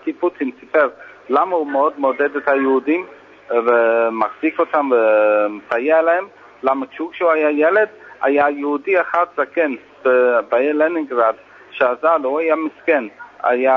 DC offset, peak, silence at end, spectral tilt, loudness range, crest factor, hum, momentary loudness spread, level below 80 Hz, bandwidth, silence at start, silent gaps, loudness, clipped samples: under 0.1%; -2 dBFS; 0 s; -6.5 dB/octave; 2 LU; 16 dB; none; 7 LU; -68 dBFS; 5.8 kHz; 0.05 s; none; -17 LUFS; under 0.1%